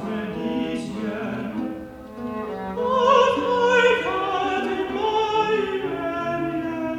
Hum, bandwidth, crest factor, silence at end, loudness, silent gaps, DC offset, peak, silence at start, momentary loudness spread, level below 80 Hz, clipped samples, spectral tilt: none; 11.5 kHz; 18 dB; 0 s; -23 LUFS; none; under 0.1%; -6 dBFS; 0 s; 13 LU; -52 dBFS; under 0.1%; -5 dB/octave